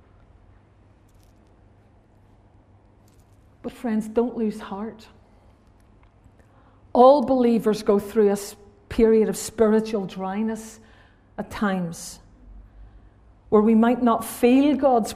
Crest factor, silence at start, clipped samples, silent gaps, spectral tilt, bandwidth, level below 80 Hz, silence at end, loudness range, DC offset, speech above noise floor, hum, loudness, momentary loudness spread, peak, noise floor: 20 dB; 3.65 s; under 0.1%; none; -6 dB/octave; 15.5 kHz; -50 dBFS; 0 s; 11 LU; under 0.1%; 34 dB; none; -21 LUFS; 19 LU; -2 dBFS; -55 dBFS